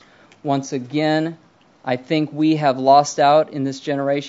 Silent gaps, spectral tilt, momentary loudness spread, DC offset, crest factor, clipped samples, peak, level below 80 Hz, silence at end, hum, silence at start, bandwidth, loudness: none; -5.5 dB/octave; 12 LU; under 0.1%; 18 dB; under 0.1%; -2 dBFS; -72 dBFS; 0 s; none; 0.45 s; 7.8 kHz; -19 LUFS